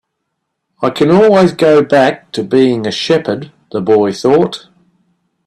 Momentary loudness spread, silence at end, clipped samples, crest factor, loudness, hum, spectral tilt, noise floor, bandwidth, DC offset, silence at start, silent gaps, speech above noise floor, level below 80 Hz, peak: 12 LU; 0.9 s; under 0.1%; 12 dB; -11 LUFS; none; -6 dB/octave; -71 dBFS; 12.5 kHz; under 0.1%; 0.8 s; none; 61 dB; -52 dBFS; 0 dBFS